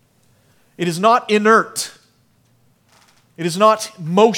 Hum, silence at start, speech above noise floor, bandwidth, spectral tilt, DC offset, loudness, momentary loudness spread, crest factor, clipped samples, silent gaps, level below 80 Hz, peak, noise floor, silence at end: none; 0.8 s; 43 dB; 17.5 kHz; -4.5 dB/octave; under 0.1%; -16 LUFS; 12 LU; 18 dB; under 0.1%; none; -72 dBFS; 0 dBFS; -58 dBFS; 0 s